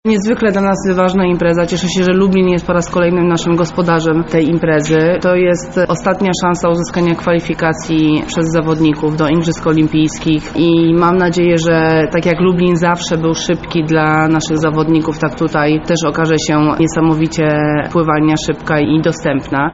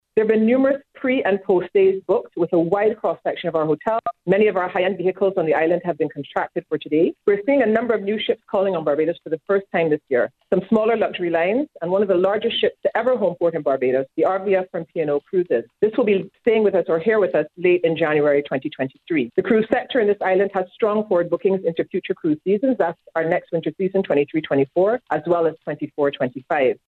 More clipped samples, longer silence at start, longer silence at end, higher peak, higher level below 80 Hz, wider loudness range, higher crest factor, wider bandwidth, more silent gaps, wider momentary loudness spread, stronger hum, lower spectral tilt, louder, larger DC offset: neither; about the same, 0.05 s vs 0.15 s; second, 0 s vs 0.15 s; about the same, 0 dBFS vs -2 dBFS; first, -36 dBFS vs -64 dBFS; about the same, 2 LU vs 2 LU; about the same, 12 dB vs 16 dB; first, 8 kHz vs 4.3 kHz; neither; about the same, 4 LU vs 6 LU; neither; second, -5.5 dB/octave vs -8.5 dB/octave; first, -13 LUFS vs -20 LUFS; first, 0.2% vs under 0.1%